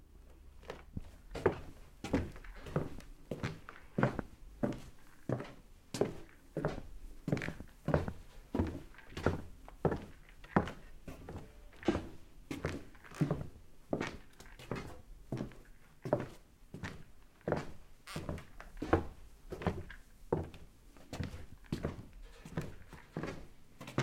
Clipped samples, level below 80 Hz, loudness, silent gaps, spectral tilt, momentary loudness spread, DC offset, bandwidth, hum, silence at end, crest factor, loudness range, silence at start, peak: under 0.1%; -54 dBFS; -41 LUFS; none; -7 dB/octave; 20 LU; under 0.1%; 16.5 kHz; none; 0 s; 28 dB; 4 LU; 0 s; -12 dBFS